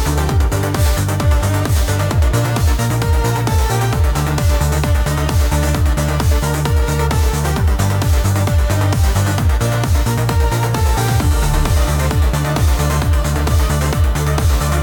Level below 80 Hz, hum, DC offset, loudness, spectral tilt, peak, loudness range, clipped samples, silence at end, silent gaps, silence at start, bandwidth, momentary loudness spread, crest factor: -18 dBFS; none; under 0.1%; -16 LUFS; -5.5 dB/octave; -2 dBFS; 0 LU; under 0.1%; 0 s; none; 0 s; 19 kHz; 1 LU; 12 dB